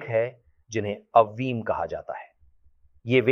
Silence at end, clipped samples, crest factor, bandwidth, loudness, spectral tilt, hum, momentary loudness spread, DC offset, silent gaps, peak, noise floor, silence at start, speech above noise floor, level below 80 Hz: 0 s; under 0.1%; 22 dB; 6.8 kHz; -26 LUFS; -6.5 dB/octave; none; 16 LU; under 0.1%; none; -4 dBFS; -58 dBFS; 0 s; 34 dB; -60 dBFS